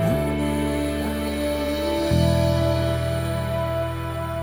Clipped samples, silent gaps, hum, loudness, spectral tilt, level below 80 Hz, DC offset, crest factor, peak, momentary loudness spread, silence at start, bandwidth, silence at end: under 0.1%; none; none; -23 LUFS; -6.5 dB/octave; -36 dBFS; under 0.1%; 14 dB; -8 dBFS; 6 LU; 0 s; 19.5 kHz; 0 s